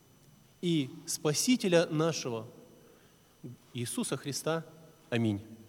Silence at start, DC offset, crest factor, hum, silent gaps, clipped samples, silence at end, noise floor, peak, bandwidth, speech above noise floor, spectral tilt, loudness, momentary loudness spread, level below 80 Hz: 0.6 s; under 0.1%; 22 dB; none; none; under 0.1%; 0.05 s; -61 dBFS; -12 dBFS; 18.5 kHz; 30 dB; -4.5 dB/octave; -32 LUFS; 22 LU; -76 dBFS